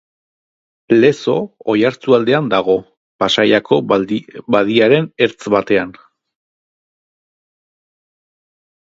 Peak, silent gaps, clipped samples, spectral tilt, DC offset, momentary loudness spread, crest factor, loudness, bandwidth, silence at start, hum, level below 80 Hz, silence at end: 0 dBFS; 2.97-3.19 s; under 0.1%; -6 dB/octave; under 0.1%; 7 LU; 16 dB; -15 LUFS; 7.8 kHz; 0.9 s; none; -58 dBFS; 3 s